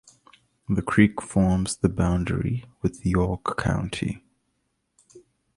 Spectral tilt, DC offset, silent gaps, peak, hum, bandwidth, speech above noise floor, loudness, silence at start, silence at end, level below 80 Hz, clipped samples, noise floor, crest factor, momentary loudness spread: -6.5 dB/octave; under 0.1%; none; -2 dBFS; none; 11.5 kHz; 51 dB; -25 LUFS; 0.7 s; 0.4 s; -40 dBFS; under 0.1%; -74 dBFS; 22 dB; 10 LU